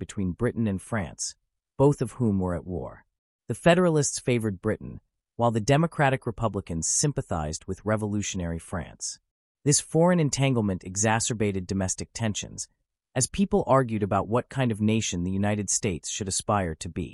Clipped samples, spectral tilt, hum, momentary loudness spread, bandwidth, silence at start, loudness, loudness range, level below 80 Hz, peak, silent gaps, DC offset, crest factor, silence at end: under 0.1%; -5 dB/octave; none; 12 LU; 13.5 kHz; 0 s; -26 LUFS; 3 LU; -50 dBFS; -8 dBFS; 3.18-3.39 s, 9.31-9.55 s; under 0.1%; 18 dB; 0 s